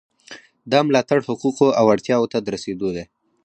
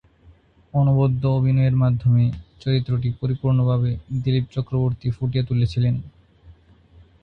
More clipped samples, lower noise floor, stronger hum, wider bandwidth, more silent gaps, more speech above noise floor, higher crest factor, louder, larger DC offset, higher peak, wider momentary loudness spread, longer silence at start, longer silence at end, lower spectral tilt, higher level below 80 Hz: neither; second, -44 dBFS vs -53 dBFS; neither; first, 9.6 kHz vs 5.4 kHz; neither; second, 25 dB vs 33 dB; about the same, 18 dB vs 14 dB; about the same, -19 LUFS vs -21 LUFS; neither; first, -2 dBFS vs -8 dBFS; first, 11 LU vs 7 LU; second, 0.3 s vs 0.75 s; second, 0.4 s vs 0.7 s; second, -5.5 dB/octave vs -10 dB/octave; second, -58 dBFS vs -44 dBFS